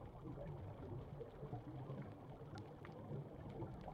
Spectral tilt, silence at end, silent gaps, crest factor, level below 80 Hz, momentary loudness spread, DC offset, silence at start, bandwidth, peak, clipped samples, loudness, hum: -9 dB/octave; 0 s; none; 16 dB; -64 dBFS; 3 LU; under 0.1%; 0 s; 9.8 kHz; -36 dBFS; under 0.1%; -53 LUFS; none